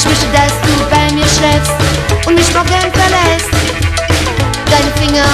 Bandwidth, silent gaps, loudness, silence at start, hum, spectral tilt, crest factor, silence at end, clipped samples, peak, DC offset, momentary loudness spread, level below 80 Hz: 14.5 kHz; none; -10 LUFS; 0 s; none; -4 dB/octave; 10 dB; 0 s; under 0.1%; 0 dBFS; under 0.1%; 4 LU; -20 dBFS